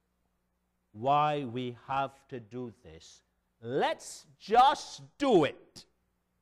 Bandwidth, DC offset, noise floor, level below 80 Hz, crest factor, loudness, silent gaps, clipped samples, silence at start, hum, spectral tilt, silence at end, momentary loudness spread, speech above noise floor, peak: 13 kHz; under 0.1%; -78 dBFS; -66 dBFS; 18 dB; -29 LUFS; none; under 0.1%; 0.95 s; none; -5 dB/octave; 0.6 s; 21 LU; 48 dB; -12 dBFS